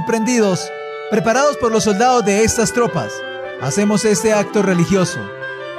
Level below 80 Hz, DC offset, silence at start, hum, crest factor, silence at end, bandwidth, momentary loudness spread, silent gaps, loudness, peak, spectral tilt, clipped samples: -44 dBFS; under 0.1%; 0 s; none; 12 dB; 0 s; 14.5 kHz; 12 LU; none; -16 LUFS; -4 dBFS; -4.5 dB/octave; under 0.1%